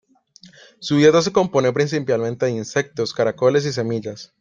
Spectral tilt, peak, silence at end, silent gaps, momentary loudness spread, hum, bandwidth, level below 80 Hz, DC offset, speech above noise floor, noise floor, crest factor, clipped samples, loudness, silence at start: -5.5 dB/octave; -2 dBFS; 0.15 s; none; 11 LU; none; 7.6 kHz; -60 dBFS; under 0.1%; 31 dB; -50 dBFS; 18 dB; under 0.1%; -19 LUFS; 0.8 s